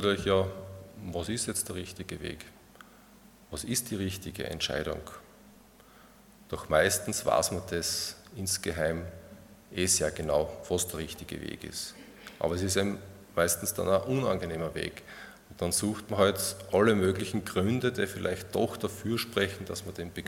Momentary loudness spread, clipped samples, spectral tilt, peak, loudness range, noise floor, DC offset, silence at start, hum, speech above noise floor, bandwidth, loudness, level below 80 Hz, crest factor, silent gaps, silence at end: 15 LU; under 0.1%; -4 dB/octave; -10 dBFS; 7 LU; -56 dBFS; under 0.1%; 0 s; none; 26 dB; 18 kHz; -30 LUFS; -56 dBFS; 22 dB; none; 0 s